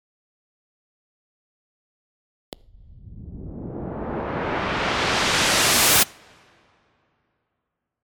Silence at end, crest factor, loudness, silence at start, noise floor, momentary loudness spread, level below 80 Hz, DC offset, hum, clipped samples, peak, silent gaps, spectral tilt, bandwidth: 1.95 s; 20 dB; -19 LUFS; 2.9 s; -81 dBFS; 21 LU; -46 dBFS; under 0.1%; none; under 0.1%; -6 dBFS; none; -1.5 dB/octave; 19 kHz